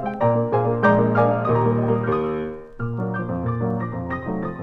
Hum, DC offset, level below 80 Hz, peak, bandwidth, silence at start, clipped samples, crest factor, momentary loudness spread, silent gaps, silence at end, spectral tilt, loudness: none; under 0.1%; -48 dBFS; -4 dBFS; 4.9 kHz; 0 s; under 0.1%; 18 dB; 10 LU; none; 0 s; -10.5 dB/octave; -22 LUFS